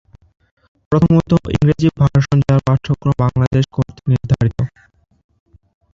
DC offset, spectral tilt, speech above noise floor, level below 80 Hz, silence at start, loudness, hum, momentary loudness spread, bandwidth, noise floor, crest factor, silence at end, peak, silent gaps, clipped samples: under 0.1%; -8.5 dB/octave; 39 dB; -36 dBFS; 0.9 s; -16 LUFS; none; 6 LU; 7.4 kHz; -53 dBFS; 14 dB; 1.25 s; -2 dBFS; 3.47-3.51 s; under 0.1%